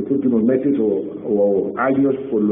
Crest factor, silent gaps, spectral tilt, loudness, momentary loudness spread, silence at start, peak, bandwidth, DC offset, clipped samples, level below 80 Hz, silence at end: 12 dB; none; -5 dB/octave; -18 LUFS; 4 LU; 0 s; -6 dBFS; 3.7 kHz; under 0.1%; under 0.1%; -58 dBFS; 0 s